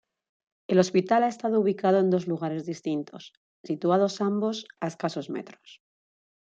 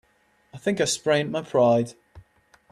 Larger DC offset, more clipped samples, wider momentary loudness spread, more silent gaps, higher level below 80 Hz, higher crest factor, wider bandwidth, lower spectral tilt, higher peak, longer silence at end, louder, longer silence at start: neither; neither; first, 14 LU vs 9 LU; first, 3.37-3.64 s vs none; second, -74 dBFS vs -62 dBFS; about the same, 20 dB vs 18 dB; second, 7.8 kHz vs 13 kHz; first, -6.5 dB/octave vs -4.5 dB/octave; about the same, -6 dBFS vs -8 dBFS; first, 0.8 s vs 0.5 s; second, -26 LUFS vs -23 LUFS; first, 0.7 s vs 0.55 s